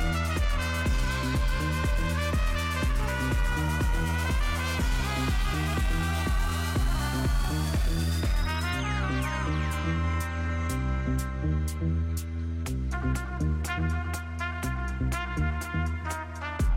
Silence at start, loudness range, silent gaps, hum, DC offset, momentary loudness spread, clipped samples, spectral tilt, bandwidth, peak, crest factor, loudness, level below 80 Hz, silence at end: 0 s; 3 LU; none; none; under 0.1%; 4 LU; under 0.1%; -5.5 dB/octave; 16.5 kHz; -16 dBFS; 10 dB; -29 LUFS; -30 dBFS; 0 s